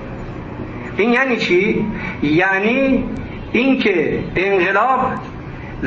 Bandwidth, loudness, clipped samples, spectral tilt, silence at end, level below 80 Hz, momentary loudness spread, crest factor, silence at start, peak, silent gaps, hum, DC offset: 7.4 kHz; -16 LUFS; under 0.1%; -6.5 dB/octave; 0 s; -38 dBFS; 15 LU; 14 dB; 0 s; -4 dBFS; none; none; under 0.1%